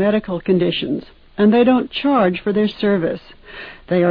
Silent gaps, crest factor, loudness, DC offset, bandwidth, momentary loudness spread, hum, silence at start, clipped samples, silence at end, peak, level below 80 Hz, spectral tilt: none; 14 dB; -17 LUFS; under 0.1%; 5.2 kHz; 20 LU; none; 0 s; under 0.1%; 0 s; -4 dBFS; -48 dBFS; -9.5 dB/octave